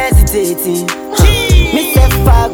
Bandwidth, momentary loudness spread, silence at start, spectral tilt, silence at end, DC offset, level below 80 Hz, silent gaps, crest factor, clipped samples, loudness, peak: over 20 kHz; 6 LU; 0 s; -5 dB/octave; 0 s; under 0.1%; -12 dBFS; none; 10 dB; 1%; -11 LUFS; 0 dBFS